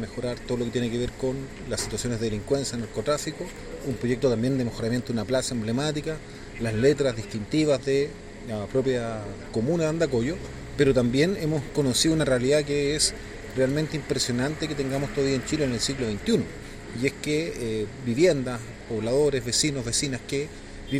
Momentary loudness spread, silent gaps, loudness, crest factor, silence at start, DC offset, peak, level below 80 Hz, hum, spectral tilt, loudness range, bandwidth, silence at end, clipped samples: 12 LU; none; -26 LUFS; 18 dB; 0 s; under 0.1%; -8 dBFS; -44 dBFS; none; -4.5 dB/octave; 4 LU; 16 kHz; 0 s; under 0.1%